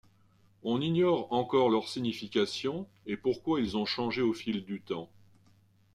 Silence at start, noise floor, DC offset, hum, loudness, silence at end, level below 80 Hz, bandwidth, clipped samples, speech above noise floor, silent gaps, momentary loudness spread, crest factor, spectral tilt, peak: 0.65 s; -64 dBFS; under 0.1%; none; -31 LUFS; 0.9 s; -66 dBFS; 12.5 kHz; under 0.1%; 34 dB; none; 12 LU; 18 dB; -6 dB/octave; -14 dBFS